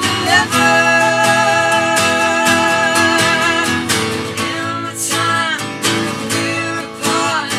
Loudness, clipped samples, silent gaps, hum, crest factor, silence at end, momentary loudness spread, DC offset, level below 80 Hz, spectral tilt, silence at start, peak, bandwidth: -14 LUFS; under 0.1%; none; none; 14 dB; 0 s; 8 LU; under 0.1%; -56 dBFS; -2.5 dB/octave; 0 s; -2 dBFS; 17.5 kHz